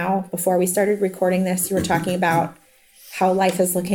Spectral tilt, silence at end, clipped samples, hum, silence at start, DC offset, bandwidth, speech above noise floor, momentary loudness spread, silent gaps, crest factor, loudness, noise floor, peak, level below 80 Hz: -5 dB/octave; 0 s; under 0.1%; none; 0 s; under 0.1%; 19.5 kHz; 28 dB; 4 LU; none; 14 dB; -20 LUFS; -48 dBFS; -6 dBFS; -54 dBFS